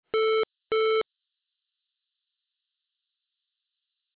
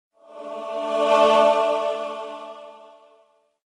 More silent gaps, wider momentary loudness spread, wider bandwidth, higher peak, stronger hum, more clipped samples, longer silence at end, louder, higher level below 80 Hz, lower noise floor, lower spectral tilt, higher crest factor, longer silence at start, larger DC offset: neither; second, 4 LU vs 22 LU; second, 4 kHz vs 11 kHz; second, -22 dBFS vs -4 dBFS; neither; neither; first, 3.15 s vs 0.9 s; second, -26 LUFS vs -20 LUFS; about the same, -74 dBFS vs -72 dBFS; first, -84 dBFS vs -60 dBFS; first, -5.5 dB/octave vs -3 dB/octave; second, 10 dB vs 18 dB; second, 0.15 s vs 0.3 s; neither